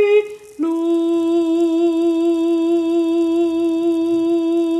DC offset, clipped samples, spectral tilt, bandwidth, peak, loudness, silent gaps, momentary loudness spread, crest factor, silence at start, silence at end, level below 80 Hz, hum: under 0.1%; under 0.1%; -5 dB/octave; 9.2 kHz; -6 dBFS; -17 LUFS; none; 2 LU; 10 dB; 0 s; 0 s; -60 dBFS; none